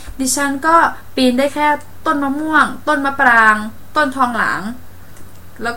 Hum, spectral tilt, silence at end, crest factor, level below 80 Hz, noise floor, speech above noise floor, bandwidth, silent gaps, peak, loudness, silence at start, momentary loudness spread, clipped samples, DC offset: none; -3 dB/octave; 0 s; 16 dB; -44 dBFS; -37 dBFS; 22 dB; 17 kHz; none; 0 dBFS; -15 LUFS; 0 s; 9 LU; under 0.1%; 3%